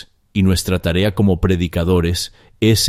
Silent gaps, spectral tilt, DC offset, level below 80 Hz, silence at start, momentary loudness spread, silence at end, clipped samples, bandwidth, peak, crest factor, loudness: none; -5.5 dB/octave; under 0.1%; -32 dBFS; 0.35 s; 6 LU; 0 s; under 0.1%; 16 kHz; -2 dBFS; 14 dB; -17 LUFS